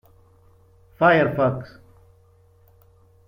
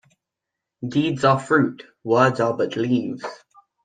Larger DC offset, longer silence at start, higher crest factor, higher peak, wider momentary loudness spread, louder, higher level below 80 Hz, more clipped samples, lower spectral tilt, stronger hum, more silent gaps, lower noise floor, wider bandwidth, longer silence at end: neither; first, 1 s vs 0.8 s; about the same, 22 dB vs 20 dB; about the same, -4 dBFS vs -2 dBFS; about the same, 18 LU vs 16 LU; about the same, -20 LUFS vs -21 LUFS; first, -58 dBFS vs -64 dBFS; neither; first, -8.5 dB/octave vs -6.5 dB/octave; neither; neither; second, -56 dBFS vs -84 dBFS; first, 16 kHz vs 9.6 kHz; first, 1.6 s vs 0.5 s